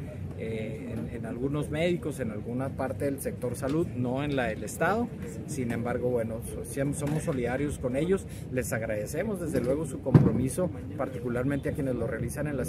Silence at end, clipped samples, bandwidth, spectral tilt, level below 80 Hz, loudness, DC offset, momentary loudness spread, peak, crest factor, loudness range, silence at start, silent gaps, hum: 0 s; under 0.1%; 15.5 kHz; -7 dB/octave; -48 dBFS; -30 LUFS; under 0.1%; 7 LU; -4 dBFS; 24 dB; 3 LU; 0 s; none; none